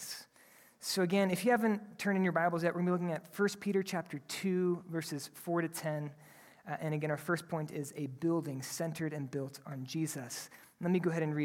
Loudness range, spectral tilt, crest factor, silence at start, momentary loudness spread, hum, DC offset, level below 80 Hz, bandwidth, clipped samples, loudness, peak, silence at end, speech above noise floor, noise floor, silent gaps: 6 LU; -5.5 dB/octave; 18 dB; 0 s; 12 LU; none; under 0.1%; -80 dBFS; 17.5 kHz; under 0.1%; -35 LUFS; -16 dBFS; 0 s; 28 dB; -62 dBFS; none